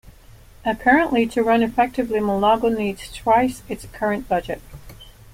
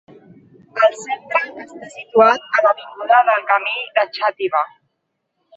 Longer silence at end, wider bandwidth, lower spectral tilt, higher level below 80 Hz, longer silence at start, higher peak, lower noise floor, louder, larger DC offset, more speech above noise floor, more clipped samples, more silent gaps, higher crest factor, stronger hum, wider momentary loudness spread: second, 0.25 s vs 0.9 s; first, 16.5 kHz vs 8.2 kHz; first, -5.5 dB/octave vs -3 dB/octave; first, -44 dBFS vs -70 dBFS; second, 0.05 s vs 0.75 s; about the same, -2 dBFS vs -2 dBFS; second, -46 dBFS vs -73 dBFS; second, -20 LUFS vs -17 LUFS; neither; second, 26 dB vs 56 dB; neither; neither; about the same, 18 dB vs 16 dB; neither; second, 11 LU vs 15 LU